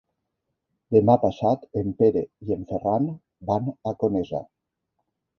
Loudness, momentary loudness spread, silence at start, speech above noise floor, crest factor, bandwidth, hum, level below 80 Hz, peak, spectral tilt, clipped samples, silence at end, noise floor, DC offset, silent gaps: -24 LUFS; 10 LU; 0.9 s; 57 dB; 22 dB; 6.4 kHz; none; -54 dBFS; -4 dBFS; -10 dB/octave; under 0.1%; 0.95 s; -80 dBFS; under 0.1%; none